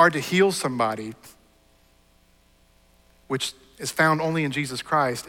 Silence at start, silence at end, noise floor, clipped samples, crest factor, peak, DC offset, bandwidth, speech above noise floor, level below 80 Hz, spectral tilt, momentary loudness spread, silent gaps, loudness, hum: 0 s; 0 s; -59 dBFS; under 0.1%; 20 dB; -6 dBFS; under 0.1%; 17.5 kHz; 36 dB; -62 dBFS; -4.5 dB/octave; 13 LU; none; -24 LUFS; none